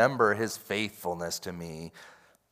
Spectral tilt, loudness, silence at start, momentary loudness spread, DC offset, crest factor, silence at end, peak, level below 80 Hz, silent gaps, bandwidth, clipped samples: -4 dB/octave; -31 LUFS; 0 s; 17 LU; under 0.1%; 22 dB; 0.4 s; -8 dBFS; -68 dBFS; none; 16 kHz; under 0.1%